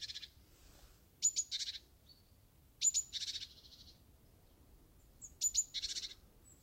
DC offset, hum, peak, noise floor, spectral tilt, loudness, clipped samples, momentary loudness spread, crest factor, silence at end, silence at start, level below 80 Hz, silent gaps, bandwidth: under 0.1%; none; -22 dBFS; -66 dBFS; 2 dB/octave; -37 LUFS; under 0.1%; 23 LU; 22 dB; 0.05 s; 0 s; -66 dBFS; none; 16 kHz